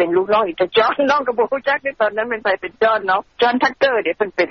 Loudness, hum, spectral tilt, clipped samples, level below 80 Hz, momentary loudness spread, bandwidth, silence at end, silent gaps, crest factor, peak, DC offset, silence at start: -17 LUFS; none; -1 dB/octave; under 0.1%; -58 dBFS; 4 LU; 6.4 kHz; 0 s; none; 14 dB; -4 dBFS; under 0.1%; 0 s